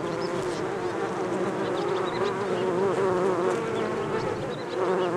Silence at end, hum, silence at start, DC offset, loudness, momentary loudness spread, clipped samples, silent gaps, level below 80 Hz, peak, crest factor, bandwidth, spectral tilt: 0 s; none; 0 s; under 0.1%; -27 LUFS; 5 LU; under 0.1%; none; -58 dBFS; -12 dBFS; 16 dB; 12 kHz; -6 dB/octave